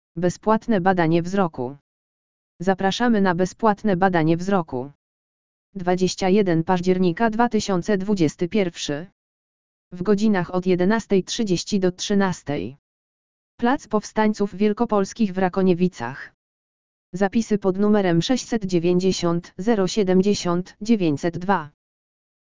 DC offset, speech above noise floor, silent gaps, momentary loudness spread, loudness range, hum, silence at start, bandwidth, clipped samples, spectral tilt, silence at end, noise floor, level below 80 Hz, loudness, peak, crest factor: 1%; over 69 dB; 1.81-2.59 s, 4.95-5.73 s, 9.12-9.91 s, 12.79-13.58 s, 16.34-17.13 s; 9 LU; 3 LU; none; 0.15 s; 7.6 kHz; under 0.1%; -6 dB/octave; 0.7 s; under -90 dBFS; -52 dBFS; -21 LUFS; -2 dBFS; 20 dB